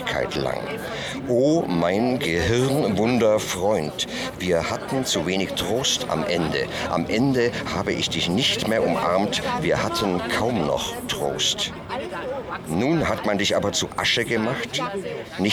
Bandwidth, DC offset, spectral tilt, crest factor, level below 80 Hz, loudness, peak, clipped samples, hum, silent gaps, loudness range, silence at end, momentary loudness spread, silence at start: 19.5 kHz; under 0.1%; -4 dB/octave; 16 dB; -46 dBFS; -23 LUFS; -8 dBFS; under 0.1%; none; none; 2 LU; 0 s; 7 LU; 0 s